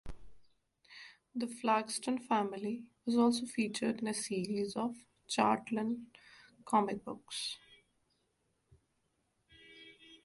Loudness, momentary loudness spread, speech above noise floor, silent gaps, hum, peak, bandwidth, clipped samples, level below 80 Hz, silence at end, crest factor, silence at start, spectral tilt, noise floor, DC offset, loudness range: -35 LUFS; 23 LU; 45 dB; none; none; -16 dBFS; 11.5 kHz; under 0.1%; -64 dBFS; 0.1 s; 20 dB; 0.05 s; -4 dB/octave; -79 dBFS; under 0.1%; 6 LU